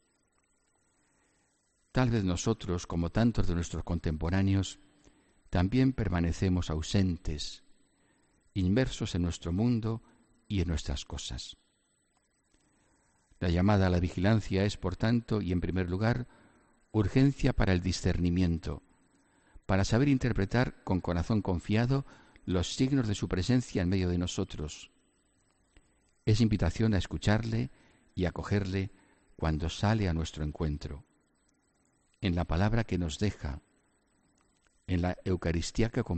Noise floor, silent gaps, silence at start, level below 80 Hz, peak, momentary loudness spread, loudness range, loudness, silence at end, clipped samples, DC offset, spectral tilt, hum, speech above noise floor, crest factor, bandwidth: -73 dBFS; none; 1.95 s; -44 dBFS; -10 dBFS; 11 LU; 5 LU; -31 LUFS; 0 s; under 0.1%; under 0.1%; -6.5 dB/octave; none; 44 dB; 20 dB; 8.8 kHz